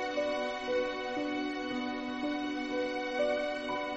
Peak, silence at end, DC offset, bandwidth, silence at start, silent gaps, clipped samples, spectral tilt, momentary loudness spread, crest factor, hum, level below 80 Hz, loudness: -20 dBFS; 0 s; under 0.1%; 8.4 kHz; 0 s; none; under 0.1%; -4 dB/octave; 4 LU; 14 dB; none; -62 dBFS; -34 LUFS